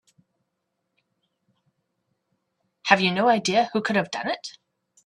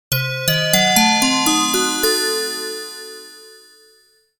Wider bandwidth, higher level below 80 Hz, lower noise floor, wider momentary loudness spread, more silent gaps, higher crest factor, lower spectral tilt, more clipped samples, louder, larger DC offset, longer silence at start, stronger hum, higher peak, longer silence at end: second, 12 kHz vs 19 kHz; second, -72 dBFS vs -50 dBFS; first, -79 dBFS vs -55 dBFS; second, 13 LU vs 17 LU; neither; first, 26 dB vs 20 dB; first, -4 dB/octave vs -2.5 dB/octave; neither; second, -22 LUFS vs -16 LUFS; neither; first, 2.85 s vs 0.1 s; neither; about the same, 0 dBFS vs 0 dBFS; second, 0.55 s vs 0.85 s